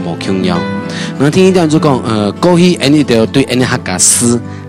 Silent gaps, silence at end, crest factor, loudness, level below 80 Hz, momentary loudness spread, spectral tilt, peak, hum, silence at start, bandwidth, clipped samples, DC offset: none; 0 s; 10 dB; -10 LUFS; -44 dBFS; 8 LU; -4.5 dB/octave; 0 dBFS; none; 0 s; over 20 kHz; under 0.1%; under 0.1%